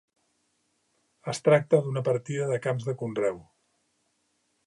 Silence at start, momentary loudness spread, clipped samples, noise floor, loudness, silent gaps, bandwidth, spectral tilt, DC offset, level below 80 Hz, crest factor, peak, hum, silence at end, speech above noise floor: 1.25 s; 12 LU; under 0.1%; -73 dBFS; -27 LUFS; none; 11.5 kHz; -6.5 dB/octave; under 0.1%; -72 dBFS; 20 dB; -8 dBFS; none; 1.25 s; 47 dB